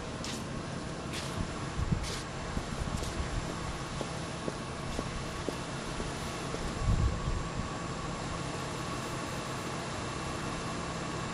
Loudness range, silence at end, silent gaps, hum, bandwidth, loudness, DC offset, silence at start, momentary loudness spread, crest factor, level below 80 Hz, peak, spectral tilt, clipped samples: 2 LU; 0 s; none; none; 13.5 kHz; -36 LUFS; under 0.1%; 0 s; 4 LU; 18 dB; -42 dBFS; -16 dBFS; -4.5 dB/octave; under 0.1%